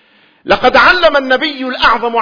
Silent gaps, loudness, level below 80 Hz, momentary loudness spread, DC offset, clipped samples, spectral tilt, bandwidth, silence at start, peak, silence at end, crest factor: none; -10 LUFS; -36 dBFS; 7 LU; under 0.1%; 0.3%; -4 dB/octave; 5.4 kHz; 0.45 s; 0 dBFS; 0 s; 12 dB